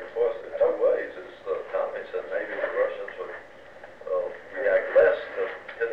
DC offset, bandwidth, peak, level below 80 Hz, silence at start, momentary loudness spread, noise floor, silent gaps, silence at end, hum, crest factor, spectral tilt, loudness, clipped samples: 0.2%; 5.8 kHz; -10 dBFS; -66 dBFS; 0 s; 17 LU; -47 dBFS; none; 0 s; none; 18 dB; -5 dB/octave; -27 LUFS; under 0.1%